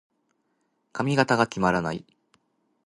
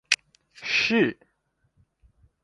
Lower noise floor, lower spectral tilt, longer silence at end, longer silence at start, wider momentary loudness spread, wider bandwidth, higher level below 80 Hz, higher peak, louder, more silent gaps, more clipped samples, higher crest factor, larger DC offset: about the same, -73 dBFS vs -72 dBFS; first, -5.5 dB/octave vs -3 dB/octave; second, 0.9 s vs 1.3 s; first, 0.95 s vs 0.1 s; first, 14 LU vs 7 LU; about the same, 11.5 kHz vs 11.5 kHz; first, -58 dBFS vs -64 dBFS; about the same, -4 dBFS vs -4 dBFS; about the same, -24 LUFS vs -24 LUFS; neither; neither; about the same, 24 dB vs 26 dB; neither